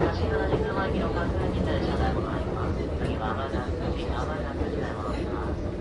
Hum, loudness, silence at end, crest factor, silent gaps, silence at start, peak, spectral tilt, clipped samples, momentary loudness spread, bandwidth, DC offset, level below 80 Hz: none; -29 LUFS; 0 s; 18 dB; none; 0 s; -10 dBFS; -7.5 dB/octave; under 0.1%; 4 LU; 11 kHz; under 0.1%; -34 dBFS